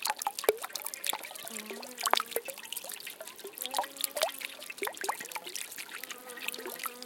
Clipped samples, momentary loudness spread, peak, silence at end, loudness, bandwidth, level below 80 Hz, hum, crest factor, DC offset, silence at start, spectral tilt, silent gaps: under 0.1%; 10 LU; -4 dBFS; 0 s; -35 LUFS; 17 kHz; -86 dBFS; none; 32 dB; under 0.1%; 0 s; 0.5 dB/octave; none